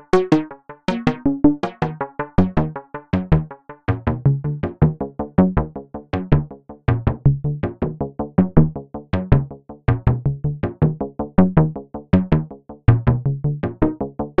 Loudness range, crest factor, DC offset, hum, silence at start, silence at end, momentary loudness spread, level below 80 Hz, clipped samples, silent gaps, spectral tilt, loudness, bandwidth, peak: 2 LU; 18 dB; under 0.1%; none; 0.15 s; 0.1 s; 11 LU; -32 dBFS; under 0.1%; none; -9.5 dB/octave; -20 LUFS; 7 kHz; 0 dBFS